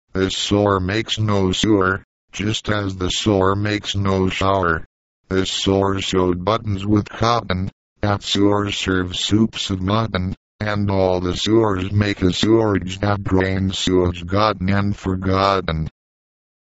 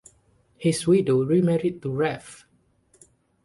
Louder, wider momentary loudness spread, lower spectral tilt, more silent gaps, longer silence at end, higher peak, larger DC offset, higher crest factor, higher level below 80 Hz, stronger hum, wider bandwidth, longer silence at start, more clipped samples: first, -19 LUFS vs -23 LUFS; about the same, 7 LU vs 7 LU; about the same, -5.5 dB/octave vs -6.5 dB/octave; first, 2.04-2.28 s, 4.86-5.24 s, 7.73-7.96 s, 10.37-10.59 s vs none; second, 0.85 s vs 1.1 s; first, -2 dBFS vs -8 dBFS; neither; about the same, 18 dB vs 16 dB; first, -40 dBFS vs -60 dBFS; neither; second, 8 kHz vs 11.5 kHz; second, 0.15 s vs 0.6 s; neither